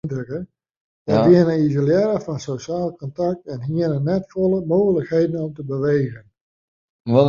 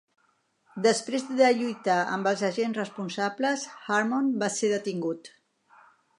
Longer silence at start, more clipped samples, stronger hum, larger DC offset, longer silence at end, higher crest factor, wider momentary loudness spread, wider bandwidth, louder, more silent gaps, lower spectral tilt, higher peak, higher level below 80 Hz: second, 0.05 s vs 0.75 s; neither; neither; neither; second, 0 s vs 0.9 s; about the same, 18 dB vs 18 dB; first, 13 LU vs 10 LU; second, 7.4 kHz vs 11 kHz; first, -20 LUFS vs -27 LUFS; first, 0.77-1.05 s, 6.41-7.05 s vs none; first, -8.5 dB/octave vs -4 dB/octave; first, -2 dBFS vs -8 dBFS; first, -54 dBFS vs -82 dBFS